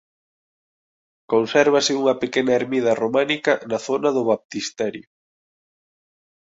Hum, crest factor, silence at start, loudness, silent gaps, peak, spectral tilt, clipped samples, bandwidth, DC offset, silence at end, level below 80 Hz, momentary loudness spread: none; 20 dB; 1.3 s; -20 LUFS; 4.45-4.49 s; -2 dBFS; -4 dB/octave; under 0.1%; 8 kHz; under 0.1%; 1.45 s; -66 dBFS; 9 LU